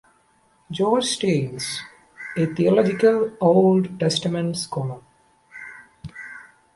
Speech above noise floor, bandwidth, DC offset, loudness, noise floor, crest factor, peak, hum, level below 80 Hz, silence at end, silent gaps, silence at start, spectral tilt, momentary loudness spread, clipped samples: 41 dB; 11.5 kHz; under 0.1%; -21 LUFS; -61 dBFS; 18 dB; -4 dBFS; none; -60 dBFS; 0.35 s; none; 0.7 s; -5.5 dB/octave; 23 LU; under 0.1%